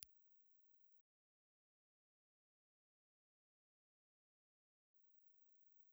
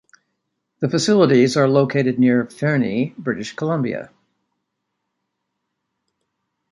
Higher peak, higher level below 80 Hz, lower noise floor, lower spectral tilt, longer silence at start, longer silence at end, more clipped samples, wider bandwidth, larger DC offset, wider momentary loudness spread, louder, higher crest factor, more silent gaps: second, -28 dBFS vs -2 dBFS; second, under -90 dBFS vs -64 dBFS; first, under -90 dBFS vs -77 dBFS; second, 0.5 dB/octave vs -6 dB/octave; second, 0 s vs 0.8 s; second, 0 s vs 2.65 s; neither; first, over 20 kHz vs 11.5 kHz; neither; second, 4 LU vs 11 LU; second, -68 LUFS vs -18 LUFS; first, 46 dB vs 18 dB; first, 1.01-4.94 s vs none